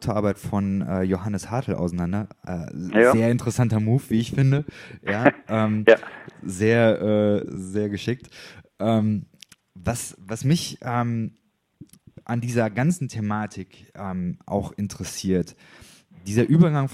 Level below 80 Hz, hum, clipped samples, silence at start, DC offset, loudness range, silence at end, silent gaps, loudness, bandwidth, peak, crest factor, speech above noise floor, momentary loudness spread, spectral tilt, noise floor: -52 dBFS; none; under 0.1%; 0 s; under 0.1%; 7 LU; 0 s; none; -23 LUFS; 15.5 kHz; 0 dBFS; 24 dB; 28 dB; 15 LU; -6.5 dB/octave; -50 dBFS